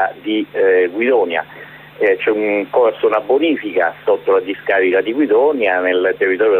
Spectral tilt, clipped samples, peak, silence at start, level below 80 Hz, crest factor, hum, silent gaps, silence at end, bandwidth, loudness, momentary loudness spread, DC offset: -7 dB/octave; under 0.1%; -4 dBFS; 0 s; -62 dBFS; 12 dB; none; none; 0 s; 4.1 kHz; -15 LUFS; 6 LU; under 0.1%